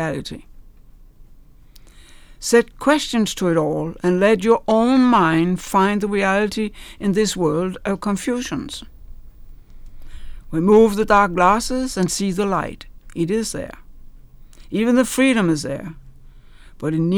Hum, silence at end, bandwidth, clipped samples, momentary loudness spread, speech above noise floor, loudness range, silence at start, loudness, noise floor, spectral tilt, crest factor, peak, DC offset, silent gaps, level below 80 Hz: none; 0 s; 19.5 kHz; under 0.1%; 14 LU; 27 dB; 7 LU; 0 s; -18 LUFS; -45 dBFS; -5 dB/octave; 16 dB; -2 dBFS; under 0.1%; none; -40 dBFS